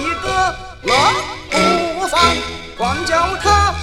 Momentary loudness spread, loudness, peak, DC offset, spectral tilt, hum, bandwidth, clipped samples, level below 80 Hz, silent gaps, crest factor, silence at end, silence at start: 8 LU; -16 LUFS; 0 dBFS; under 0.1%; -3.5 dB/octave; none; 16 kHz; under 0.1%; -32 dBFS; none; 16 dB; 0 s; 0 s